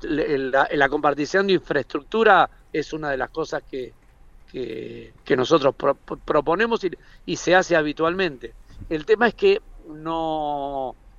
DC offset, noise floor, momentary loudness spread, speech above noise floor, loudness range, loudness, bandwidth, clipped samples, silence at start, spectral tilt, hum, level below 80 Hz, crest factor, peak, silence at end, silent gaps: under 0.1%; -49 dBFS; 16 LU; 27 dB; 4 LU; -22 LUFS; 7.6 kHz; under 0.1%; 0 s; -5 dB/octave; none; -48 dBFS; 20 dB; -2 dBFS; 0.1 s; none